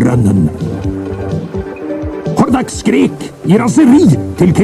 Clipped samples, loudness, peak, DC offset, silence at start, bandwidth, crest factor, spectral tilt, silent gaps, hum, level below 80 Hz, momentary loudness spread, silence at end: under 0.1%; -12 LUFS; 0 dBFS; under 0.1%; 0 s; 13.5 kHz; 10 dB; -7 dB/octave; none; none; -34 dBFS; 13 LU; 0 s